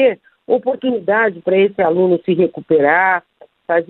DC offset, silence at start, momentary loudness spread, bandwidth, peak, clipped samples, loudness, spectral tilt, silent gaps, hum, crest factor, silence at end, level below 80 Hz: under 0.1%; 0 s; 7 LU; 4.1 kHz; -2 dBFS; under 0.1%; -15 LUFS; -10 dB/octave; none; none; 14 dB; 0.05 s; -62 dBFS